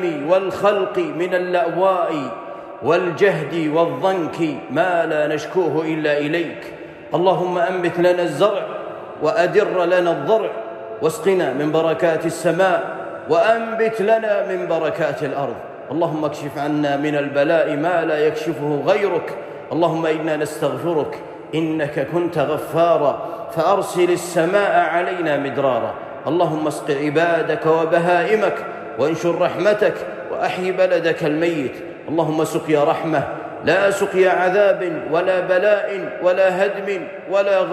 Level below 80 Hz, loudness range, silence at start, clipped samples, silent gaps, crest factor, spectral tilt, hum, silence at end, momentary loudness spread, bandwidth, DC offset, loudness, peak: -64 dBFS; 3 LU; 0 s; under 0.1%; none; 14 dB; -6 dB/octave; none; 0 s; 9 LU; 14.5 kHz; under 0.1%; -19 LUFS; -4 dBFS